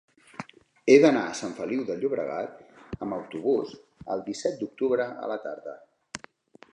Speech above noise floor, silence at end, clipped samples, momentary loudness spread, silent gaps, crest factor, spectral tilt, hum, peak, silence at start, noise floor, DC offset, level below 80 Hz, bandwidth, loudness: 27 dB; 0.55 s; under 0.1%; 23 LU; none; 24 dB; -5 dB/octave; none; -4 dBFS; 0.4 s; -53 dBFS; under 0.1%; -62 dBFS; 10.5 kHz; -26 LUFS